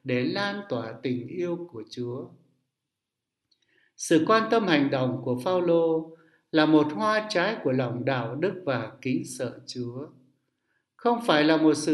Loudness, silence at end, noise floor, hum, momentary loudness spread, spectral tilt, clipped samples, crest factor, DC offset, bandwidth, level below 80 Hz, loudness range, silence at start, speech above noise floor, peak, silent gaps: -26 LUFS; 0 s; -86 dBFS; none; 14 LU; -5.5 dB/octave; under 0.1%; 22 dB; under 0.1%; 12 kHz; -72 dBFS; 9 LU; 0.05 s; 60 dB; -4 dBFS; none